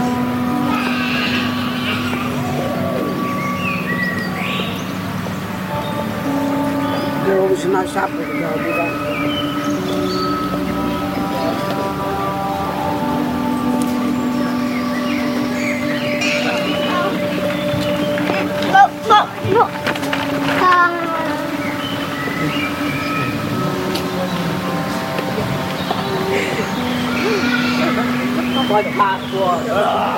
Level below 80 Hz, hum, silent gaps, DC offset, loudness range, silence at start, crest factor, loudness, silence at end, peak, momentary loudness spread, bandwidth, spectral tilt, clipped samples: -46 dBFS; none; none; under 0.1%; 4 LU; 0 s; 18 dB; -18 LUFS; 0 s; 0 dBFS; 5 LU; 17 kHz; -5.5 dB/octave; under 0.1%